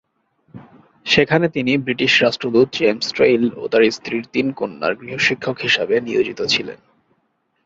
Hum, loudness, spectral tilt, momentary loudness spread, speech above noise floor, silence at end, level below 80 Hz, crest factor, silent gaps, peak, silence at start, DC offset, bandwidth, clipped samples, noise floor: none; -17 LUFS; -4.5 dB/octave; 8 LU; 49 dB; 0.9 s; -56 dBFS; 18 dB; none; -2 dBFS; 0.55 s; under 0.1%; 7.8 kHz; under 0.1%; -67 dBFS